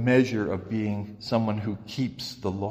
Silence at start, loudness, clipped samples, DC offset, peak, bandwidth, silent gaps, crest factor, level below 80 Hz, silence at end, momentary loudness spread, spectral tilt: 0 s; -28 LUFS; under 0.1%; under 0.1%; -8 dBFS; 15.5 kHz; none; 18 dB; -58 dBFS; 0 s; 9 LU; -7 dB/octave